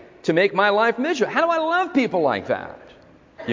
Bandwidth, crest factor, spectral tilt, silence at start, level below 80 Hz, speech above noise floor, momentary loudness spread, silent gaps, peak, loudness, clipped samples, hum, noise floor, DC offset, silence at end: 7.6 kHz; 18 dB; -5 dB/octave; 0.25 s; -62 dBFS; 29 dB; 10 LU; none; -4 dBFS; -20 LUFS; under 0.1%; none; -49 dBFS; under 0.1%; 0 s